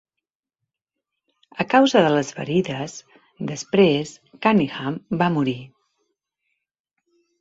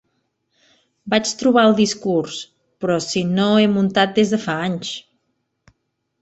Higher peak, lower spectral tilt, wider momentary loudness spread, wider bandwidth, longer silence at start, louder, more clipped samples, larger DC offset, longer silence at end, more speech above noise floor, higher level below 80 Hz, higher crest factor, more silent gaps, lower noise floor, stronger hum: about the same, -2 dBFS vs -2 dBFS; about the same, -5.5 dB/octave vs -5 dB/octave; about the same, 17 LU vs 15 LU; about the same, 8 kHz vs 8.2 kHz; first, 1.55 s vs 1.05 s; second, -21 LUFS vs -18 LUFS; neither; neither; first, 1.75 s vs 1.2 s; first, 65 dB vs 55 dB; about the same, -62 dBFS vs -60 dBFS; about the same, 20 dB vs 18 dB; neither; first, -85 dBFS vs -73 dBFS; neither